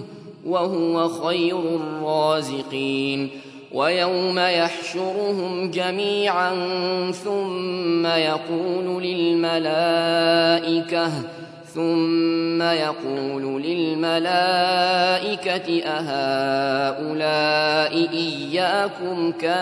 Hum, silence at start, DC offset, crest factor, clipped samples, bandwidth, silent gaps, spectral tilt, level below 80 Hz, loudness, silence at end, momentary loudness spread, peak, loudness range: none; 0 s; under 0.1%; 18 dB; under 0.1%; 11 kHz; none; -5 dB/octave; -72 dBFS; -22 LUFS; 0 s; 7 LU; -4 dBFS; 2 LU